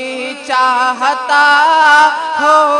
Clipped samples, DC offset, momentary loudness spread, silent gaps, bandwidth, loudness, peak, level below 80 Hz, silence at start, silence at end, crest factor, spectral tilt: 0.5%; under 0.1%; 9 LU; none; 12 kHz; -10 LUFS; 0 dBFS; -62 dBFS; 0 s; 0 s; 10 dB; -0.5 dB/octave